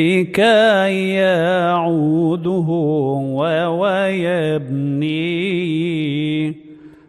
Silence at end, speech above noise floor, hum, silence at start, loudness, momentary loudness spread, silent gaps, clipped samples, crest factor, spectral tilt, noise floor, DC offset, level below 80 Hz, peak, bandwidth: 0.2 s; 24 dB; none; 0 s; -17 LUFS; 7 LU; none; under 0.1%; 14 dB; -7 dB/octave; -40 dBFS; under 0.1%; -60 dBFS; -4 dBFS; 13 kHz